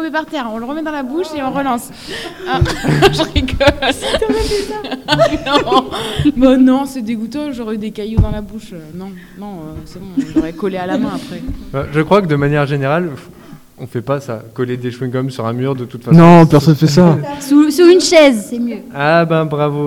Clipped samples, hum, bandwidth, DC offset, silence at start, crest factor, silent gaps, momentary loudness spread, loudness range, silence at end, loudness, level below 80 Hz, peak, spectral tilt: 0.9%; none; 16 kHz; under 0.1%; 0 s; 14 dB; none; 18 LU; 12 LU; 0 s; -13 LUFS; -32 dBFS; 0 dBFS; -6 dB/octave